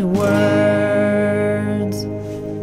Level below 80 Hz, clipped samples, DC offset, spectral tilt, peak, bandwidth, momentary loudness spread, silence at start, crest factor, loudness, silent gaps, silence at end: -46 dBFS; under 0.1%; under 0.1%; -7 dB/octave; -4 dBFS; 15.5 kHz; 11 LU; 0 s; 12 dB; -18 LUFS; none; 0 s